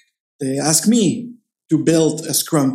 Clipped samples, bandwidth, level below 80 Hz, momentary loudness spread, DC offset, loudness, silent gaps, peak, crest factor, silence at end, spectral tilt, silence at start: under 0.1%; 16 kHz; -64 dBFS; 13 LU; under 0.1%; -17 LUFS; none; -2 dBFS; 16 dB; 0 s; -4.5 dB/octave; 0.4 s